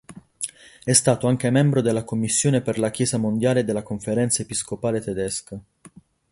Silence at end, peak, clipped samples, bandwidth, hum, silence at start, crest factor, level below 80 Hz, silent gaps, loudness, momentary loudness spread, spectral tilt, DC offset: 0.45 s; 0 dBFS; under 0.1%; 11.5 kHz; none; 0.1 s; 22 dB; -54 dBFS; none; -22 LUFS; 13 LU; -5 dB/octave; under 0.1%